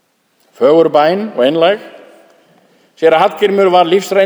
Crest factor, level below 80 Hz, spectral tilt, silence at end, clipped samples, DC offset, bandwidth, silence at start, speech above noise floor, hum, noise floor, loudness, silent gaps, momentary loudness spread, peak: 12 dB; -62 dBFS; -5 dB/octave; 0 s; under 0.1%; under 0.1%; over 20 kHz; 0.6 s; 47 dB; none; -57 dBFS; -11 LUFS; none; 5 LU; 0 dBFS